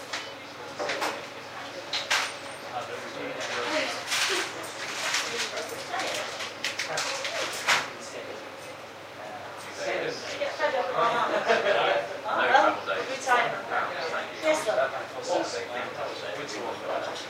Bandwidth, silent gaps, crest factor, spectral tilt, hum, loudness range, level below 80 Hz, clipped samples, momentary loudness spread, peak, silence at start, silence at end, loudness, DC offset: 16 kHz; none; 22 dB; -1.5 dB/octave; none; 6 LU; -74 dBFS; under 0.1%; 14 LU; -8 dBFS; 0 s; 0 s; -28 LUFS; under 0.1%